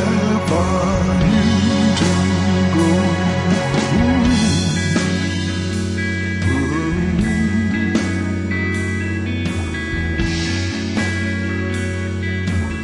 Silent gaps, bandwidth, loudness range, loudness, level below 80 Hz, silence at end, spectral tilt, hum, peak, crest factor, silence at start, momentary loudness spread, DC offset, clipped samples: none; 11.5 kHz; 5 LU; -18 LUFS; -34 dBFS; 0 s; -5.5 dB/octave; none; -4 dBFS; 14 dB; 0 s; 6 LU; under 0.1%; under 0.1%